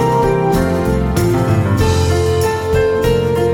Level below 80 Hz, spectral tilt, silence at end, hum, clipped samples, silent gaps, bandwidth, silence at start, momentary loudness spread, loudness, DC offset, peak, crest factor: -26 dBFS; -6.5 dB/octave; 0 s; none; under 0.1%; none; 19.5 kHz; 0 s; 2 LU; -14 LUFS; under 0.1%; -2 dBFS; 10 dB